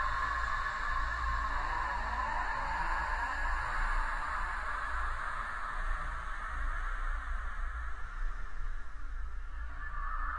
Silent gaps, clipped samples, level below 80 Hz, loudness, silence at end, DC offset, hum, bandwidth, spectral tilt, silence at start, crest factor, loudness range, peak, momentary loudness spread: none; under 0.1%; -38 dBFS; -37 LUFS; 0 s; under 0.1%; none; 11 kHz; -4 dB/octave; 0 s; 14 dB; 8 LU; -20 dBFS; 11 LU